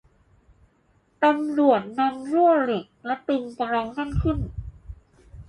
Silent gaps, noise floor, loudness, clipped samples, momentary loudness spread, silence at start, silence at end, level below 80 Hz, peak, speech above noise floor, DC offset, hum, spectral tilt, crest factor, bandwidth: none; -63 dBFS; -23 LUFS; under 0.1%; 11 LU; 1.2 s; 0.05 s; -40 dBFS; -6 dBFS; 41 dB; under 0.1%; none; -8 dB/octave; 20 dB; 10.5 kHz